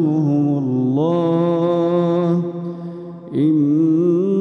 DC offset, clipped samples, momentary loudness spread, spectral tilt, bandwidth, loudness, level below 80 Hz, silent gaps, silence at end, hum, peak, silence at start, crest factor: under 0.1%; under 0.1%; 12 LU; -10.5 dB/octave; 6.4 kHz; -17 LUFS; -68 dBFS; none; 0 s; none; -6 dBFS; 0 s; 10 dB